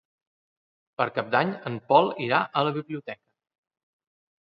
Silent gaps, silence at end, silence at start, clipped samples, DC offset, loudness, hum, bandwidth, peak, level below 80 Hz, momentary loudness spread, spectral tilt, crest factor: none; 1.3 s; 1 s; under 0.1%; under 0.1%; -25 LUFS; none; 5.6 kHz; -4 dBFS; -74 dBFS; 17 LU; -8.5 dB/octave; 24 dB